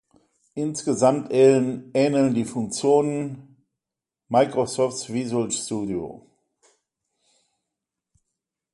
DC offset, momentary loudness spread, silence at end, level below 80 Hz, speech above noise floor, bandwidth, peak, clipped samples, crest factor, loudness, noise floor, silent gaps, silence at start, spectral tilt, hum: under 0.1%; 12 LU; 2.55 s; -64 dBFS; 66 dB; 11.5 kHz; -4 dBFS; under 0.1%; 20 dB; -22 LUFS; -88 dBFS; none; 0.55 s; -5.5 dB/octave; none